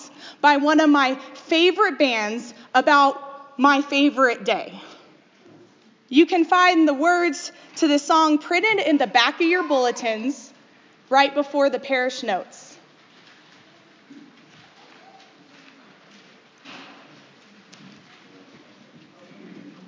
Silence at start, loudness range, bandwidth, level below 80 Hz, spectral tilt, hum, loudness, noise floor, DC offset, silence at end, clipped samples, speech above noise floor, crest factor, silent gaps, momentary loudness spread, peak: 0 s; 6 LU; 7.6 kHz; -82 dBFS; -2.5 dB/octave; none; -19 LUFS; -54 dBFS; under 0.1%; 0.2 s; under 0.1%; 35 dB; 20 dB; none; 16 LU; -2 dBFS